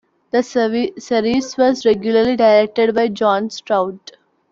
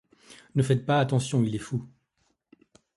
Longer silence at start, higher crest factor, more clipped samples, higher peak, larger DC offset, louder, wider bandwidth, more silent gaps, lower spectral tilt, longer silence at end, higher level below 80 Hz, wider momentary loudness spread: about the same, 0.35 s vs 0.3 s; about the same, 14 dB vs 18 dB; neither; first, -2 dBFS vs -10 dBFS; neither; first, -16 LUFS vs -27 LUFS; second, 7.6 kHz vs 11.5 kHz; neither; second, -5 dB/octave vs -6.5 dB/octave; second, 0.55 s vs 1.1 s; about the same, -56 dBFS vs -60 dBFS; about the same, 8 LU vs 10 LU